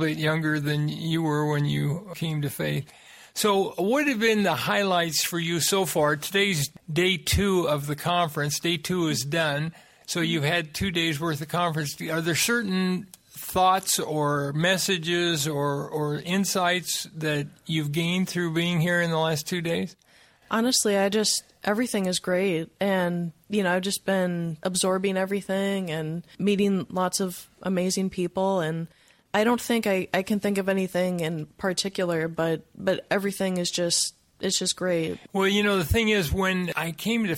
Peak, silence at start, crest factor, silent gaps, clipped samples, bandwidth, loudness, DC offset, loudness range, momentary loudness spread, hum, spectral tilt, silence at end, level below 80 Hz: -8 dBFS; 0 s; 18 dB; none; under 0.1%; 16.5 kHz; -25 LUFS; under 0.1%; 3 LU; 7 LU; none; -4 dB/octave; 0 s; -50 dBFS